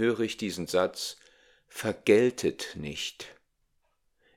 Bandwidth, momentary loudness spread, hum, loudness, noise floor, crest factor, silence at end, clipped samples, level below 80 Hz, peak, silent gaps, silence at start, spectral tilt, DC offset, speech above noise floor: 17 kHz; 21 LU; none; -29 LUFS; -73 dBFS; 22 dB; 1.05 s; under 0.1%; -64 dBFS; -8 dBFS; none; 0 s; -4.5 dB/octave; under 0.1%; 45 dB